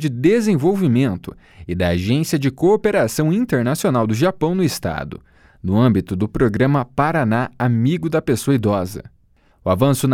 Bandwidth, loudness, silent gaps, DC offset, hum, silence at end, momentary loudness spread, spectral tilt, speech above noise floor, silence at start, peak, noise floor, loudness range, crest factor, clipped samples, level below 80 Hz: 17.5 kHz; -18 LUFS; none; under 0.1%; none; 0 s; 12 LU; -6.5 dB/octave; 38 dB; 0 s; -2 dBFS; -55 dBFS; 1 LU; 16 dB; under 0.1%; -44 dBFS